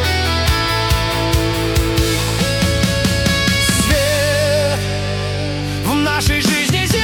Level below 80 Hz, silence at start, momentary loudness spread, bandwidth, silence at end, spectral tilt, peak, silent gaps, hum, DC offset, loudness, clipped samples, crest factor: -26 dBFS; 0 s; 6 LU; 18 kHz; 0 s; -4 dB/octave; -4 dBFS; none; none; under 0.1%; -16 LUFS; under 0.1%; 12 dB